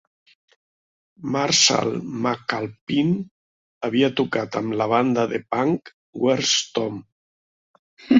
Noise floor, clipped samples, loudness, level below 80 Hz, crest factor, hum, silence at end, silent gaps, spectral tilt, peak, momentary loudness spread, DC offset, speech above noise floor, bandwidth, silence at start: under -90 dBFS; under 0.1%; -22 LUFS; -62 dBFS; 20 dB; none; 0 s; 2.81-2.87 s, 3.31-3.81 s, 5.94-6.13 s, 7.12-7.97 s; -3.5 dB/octave; -2 dBFS; 12 LU; under 0.1%; over 68 dB; 8 kHz; 1.2 s